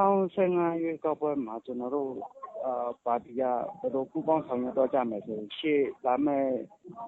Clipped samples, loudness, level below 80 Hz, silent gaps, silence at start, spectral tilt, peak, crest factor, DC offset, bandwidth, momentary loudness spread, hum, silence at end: under 0.1%; -30 LUFS; -72 dBFS; none; 0 s; -5.5 dB/octave; -12 dBFS; 16 dB; under 0.1%; 4.1 kHz; 10 LU; none; 0 s